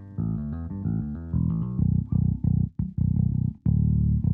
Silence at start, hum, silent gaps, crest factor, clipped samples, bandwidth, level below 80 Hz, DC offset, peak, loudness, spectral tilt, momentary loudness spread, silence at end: 0 s; none; none; 14 dB; under 0.1%; 1.7 kHz; -34 dBFS; under 0.1%; -10 dBFS; -26 LUFS; -14.5 dB/octave; 7 LU; 0 s